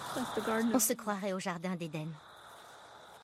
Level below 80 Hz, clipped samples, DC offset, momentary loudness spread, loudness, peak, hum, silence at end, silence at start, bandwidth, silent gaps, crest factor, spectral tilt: -72 dBFS; under 0.1%; under 0.1%; 23 LU; -34 LUFS; -16 dBFS; none; 0 s; 0 s; 16 kHz; none; 20 dB; -4 dB/octave